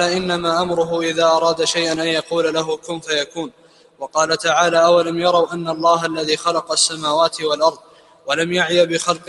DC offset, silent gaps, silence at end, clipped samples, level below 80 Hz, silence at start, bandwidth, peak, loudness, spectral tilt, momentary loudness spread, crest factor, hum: under 0.1%; none; 0.05 s; under 0.1%; -58 dBFS; 0 s; 11.5 kHz; 0 dBFS; -17 LUFS; -3 dB/octave; 8 LU; 18 dB; none